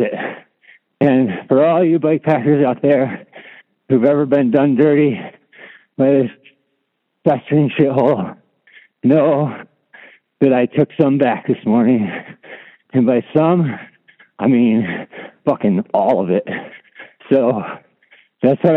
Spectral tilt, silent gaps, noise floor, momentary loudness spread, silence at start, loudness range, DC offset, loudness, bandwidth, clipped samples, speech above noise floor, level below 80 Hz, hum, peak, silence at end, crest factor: -10.5 dB/octave; none; -70 dBFS; 14 LU; 0 s; 3 LU; under 0.1%; -16 LUFS; 4.1 kHz; under 0.1%; 56 dB; -66 dBFS; none; 0 dBFS; 0 s; 16 dB